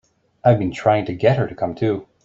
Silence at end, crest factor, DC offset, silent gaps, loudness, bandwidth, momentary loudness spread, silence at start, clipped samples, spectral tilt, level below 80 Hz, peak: 0.2 s; 18 dB; under 0.1%; none; -19 LUFS; 7.8 kHz; 5 LU; 0.45 s; under 0.1%; -8 dB/octave; -50 dBFS; -2 dBFS